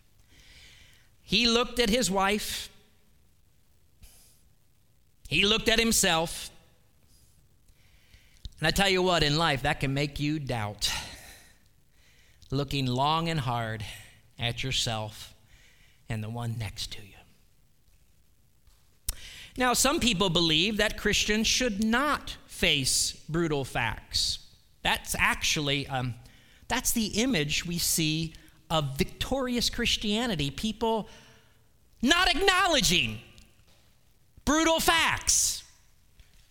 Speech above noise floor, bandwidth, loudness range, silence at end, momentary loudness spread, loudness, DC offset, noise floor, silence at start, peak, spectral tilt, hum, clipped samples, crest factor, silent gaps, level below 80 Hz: 39 dB; 19 kHz; 9 LU; 0.85 s; 14 LU; -26 LUFS; under 0.1%; -66 dBFS; 1.3 s; -6 dBFS; -3 dB/octave; none; under 0.1%; 24 dB; none; -44 dBFS